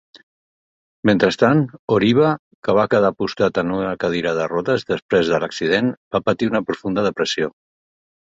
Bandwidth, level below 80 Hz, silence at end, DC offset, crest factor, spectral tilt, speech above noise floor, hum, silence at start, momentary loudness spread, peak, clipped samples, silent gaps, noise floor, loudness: 7.8 kHz; -52 dBFS; 0.8 s; under 0.1%; 18 dB; -6 dB/octave; over 72 dB; none; 1.05 s; 7 LU; -2 dBFS; under 0.1%; 1.79-1.88 s, 2.39-2.63 s, 5.02-5.09 s, 5.97-6.11 s; under -90 dBFS; -19 LUFS